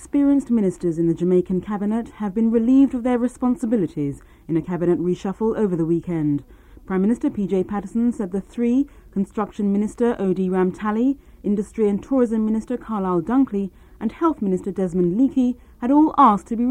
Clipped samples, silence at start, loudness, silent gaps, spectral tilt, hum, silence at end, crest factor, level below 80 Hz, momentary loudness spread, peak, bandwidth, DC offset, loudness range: under 0.1%; 0 s; -21 LUFS; none; -8.5 dB/octave; none; 0 s; 18 dB; -48 dBFS; 10 LU; -2 dBFS; 10.5 kHz; under 0.1%; 3 LU